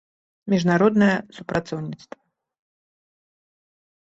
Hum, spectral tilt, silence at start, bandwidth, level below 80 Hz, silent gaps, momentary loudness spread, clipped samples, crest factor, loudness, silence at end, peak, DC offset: none; -7 dB/octave; 0.45 s; 7.8 kHz; -60 dBFS; none; 18 LU; under 0.1%; 20 dB; -21 LUFS; 2.1 s; -6 dBFS; under 0.1%